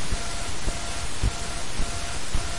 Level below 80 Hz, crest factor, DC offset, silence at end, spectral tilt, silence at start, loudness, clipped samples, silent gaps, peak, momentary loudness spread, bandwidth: -30 dBFS; 16 dB; 4%; 0 s; -3 dB/octave; 0 s; -30 LUFS; under 0.1%; none; -10 dBFS; 3 LU; 11.5 kHz